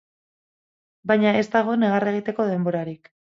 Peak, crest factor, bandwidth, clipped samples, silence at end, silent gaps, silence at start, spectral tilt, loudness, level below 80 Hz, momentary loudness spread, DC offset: -6 dBFS; 18 dB; 7.6 kHz; under 0.1%; 0.4 s; none; 1.05 s; -7.5 dB/octave; -22 LUFS; -68 dBFS; 14 LU; under 0.1%